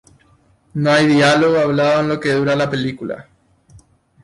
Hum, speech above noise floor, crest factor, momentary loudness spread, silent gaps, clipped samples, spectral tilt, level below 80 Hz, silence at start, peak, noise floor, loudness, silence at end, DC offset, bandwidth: none; 39 dB; 14 dB; 16 LU; none; under 0.1%; -5.5 dB/octave; -54 dBFS; 0.75 s; -4 dBFS; -54 dBFS; -15 LUFS; 1 s; under 0.1%; 11.5 kHz